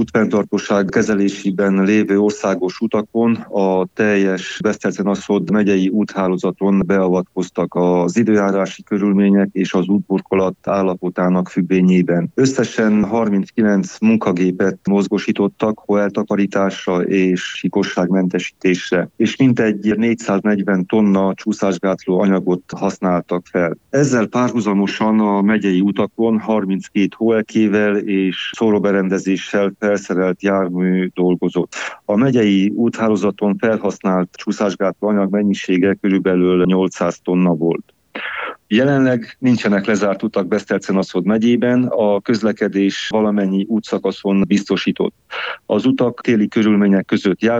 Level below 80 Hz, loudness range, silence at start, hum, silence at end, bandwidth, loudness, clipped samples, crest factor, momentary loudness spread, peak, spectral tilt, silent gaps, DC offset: -56 dBFS; 1 LU; 0 s; none; 0 s; 8 kHz; -17 LUFS; under 0.1%; 14 dB; 5 LU; -2 dBFS; -6.5 dB/octave; none; under 0.1%